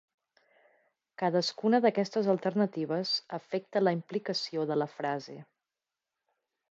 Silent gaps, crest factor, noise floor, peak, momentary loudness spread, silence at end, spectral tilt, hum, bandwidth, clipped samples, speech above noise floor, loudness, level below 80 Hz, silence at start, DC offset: none; 20 dB; under -90 dBFS; -12 dBFS; 9 LU; 1.3 s; -5.5 dB/octave; none; 8 kHz; under 0.1%; over 60 dB; -30 LUFS; -84 dBFS; 1.2 s; under 0.1%